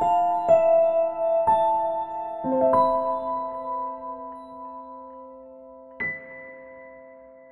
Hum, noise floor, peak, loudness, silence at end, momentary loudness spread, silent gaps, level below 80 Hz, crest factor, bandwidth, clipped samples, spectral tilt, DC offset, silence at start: none; -47 dBFS; -8 dBFS; -23 LUFS; 0.25 s; 23 LU; none; -60 dBFS; 16 dB; 8 kHz; under 0.1%; -7 dB/octave; under 0.1%; 0 s